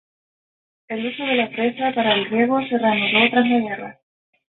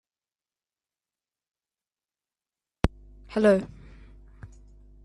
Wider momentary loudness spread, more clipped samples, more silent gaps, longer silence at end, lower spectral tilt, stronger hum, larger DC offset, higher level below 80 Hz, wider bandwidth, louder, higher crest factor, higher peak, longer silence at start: about the same, 12 LU vs 11 LU; neither; neither; about the same, 0.6 s vs 0.6 s; first, -9.5 dB/octave vs -7.5 dB/octave; neither; neither; second, -66 dBFS vs -44 dBFS; second, 4.2 kHz vs 11 kHz; first, -19 LUFS vs -25 LUFS; second, 18 dB vs 30 dB; about the same, -2 dBFS vs -2 dBFS; second, 0.9 s vs 2.85 s